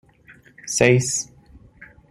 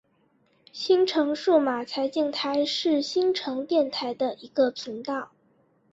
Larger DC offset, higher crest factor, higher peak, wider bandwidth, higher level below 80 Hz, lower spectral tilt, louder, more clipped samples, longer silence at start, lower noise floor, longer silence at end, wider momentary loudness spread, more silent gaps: neither; about the same, 22 dB vs 18 dB; first, -2 dBFS vs -8 dBFS; first, 15.5 kHz vs 8 kHz; first, -52 dBFS vs -72 dBFS; about the same, -4 dB/octave vs -3.5 dB/octave; first, -19 LUFS vs -25 LUFS; neither; about the same, 0.65 s vs 0.75 s; second, -51 dBFS vs -66 dBFS; second, 0.25 s vs 0.65 s; first, 20 LU vs 11 LU; neither